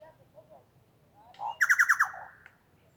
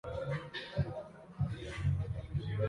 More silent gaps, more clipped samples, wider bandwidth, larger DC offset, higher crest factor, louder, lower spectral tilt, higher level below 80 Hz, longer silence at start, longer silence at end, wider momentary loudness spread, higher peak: neither; neither; first, over 20 kHz vs 11 kHz; neither; about the same, 20 dB vs 16 dB; first, -25 LUFS vs -39 LUFS; second, 0.5 dB/octave vs -7.5 dB/octave; second, -78 dBFS vs -48 dBFS; first, 1.4 s vs 0.05 s; first, 0.7 s vs 0 s; first, 18 LU vs 5 LU; first, -10 dBFS vs -22 dBFS